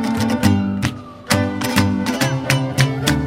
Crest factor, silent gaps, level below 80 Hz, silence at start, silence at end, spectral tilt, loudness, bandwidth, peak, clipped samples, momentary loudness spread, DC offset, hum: 18 dB; none; -40 dBFS; 0 s; 0 s; -5 dB/octave; -18 LUFS; 16.5 kHz; 0 dBFS; under 0.1%; 5 LU; under 0.1%; none